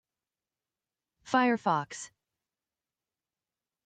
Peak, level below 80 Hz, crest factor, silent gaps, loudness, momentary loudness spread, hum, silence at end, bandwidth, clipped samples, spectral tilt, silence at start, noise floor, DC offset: -14 dBFS; -82 dBFS; 22 dB; none; -28 LUFS; 17 LU; none; 1.8 s; 9.2 kHz; under 0.1%; -4.5 dB/octave; 1.25 s; under -90 dBFS; under 0.1%